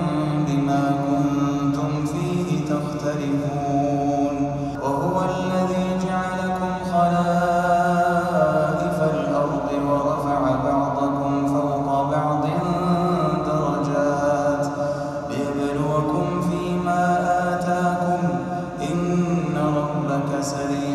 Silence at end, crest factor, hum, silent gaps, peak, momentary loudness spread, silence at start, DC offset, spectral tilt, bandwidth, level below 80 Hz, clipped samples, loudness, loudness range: 0 s; 16 dB; none; none; -6 dBFS; 5 LU; 0 s; under 0.1%; -7 dB/octave; 13 kHz; -46 dBFS; under 0.1%; -22 LUFS; 2 LU